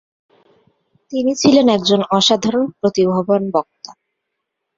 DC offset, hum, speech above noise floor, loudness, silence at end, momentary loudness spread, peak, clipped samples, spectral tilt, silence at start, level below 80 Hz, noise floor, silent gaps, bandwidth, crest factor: under 0.1%; none; 61 dB; -15 LUFS; 0.85 s; 9 LU; 0 dBFS; under 0.1%; -5 dB/octave; 1.1 s; -58 dBFS; -77 dBFS; none; 7.8 kHz; 16 dB